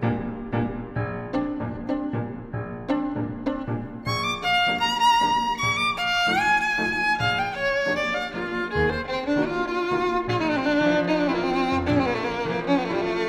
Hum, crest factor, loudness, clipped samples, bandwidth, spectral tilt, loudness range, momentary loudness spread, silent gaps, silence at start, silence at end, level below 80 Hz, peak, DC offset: none; 16 dB; -24 LUFS; under 0.1%; 15.5 kHz; -5 dB/octave; 7 LU; 9 LU; none; 0 s; 0 s; -46 dBFS; -8 dBFS; under 0.1%